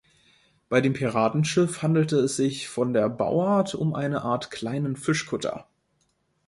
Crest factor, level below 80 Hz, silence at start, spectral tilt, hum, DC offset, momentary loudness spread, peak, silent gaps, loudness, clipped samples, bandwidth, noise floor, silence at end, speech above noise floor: 18 dB; -62 dBFS; 0.7 s; -6 dB/octave; none; under 0.1%; 7 LU; -6 dBFS; none; -25 LUFS; under 0.1%; 11.5 kHz; -71 dBFS; 0.85 s; 46 dB